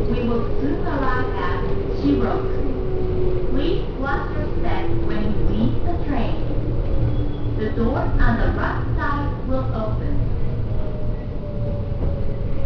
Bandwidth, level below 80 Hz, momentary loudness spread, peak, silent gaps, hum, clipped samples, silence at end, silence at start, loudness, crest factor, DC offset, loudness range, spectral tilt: 5.4 kHz; -24 dBFS; 5 LU; -6 dBFS; none; none; under 0.1%; 0 s; 0 s; -24 LUFS; 12 dB; under 0.1%; 2 LU; -9.5 dB/octave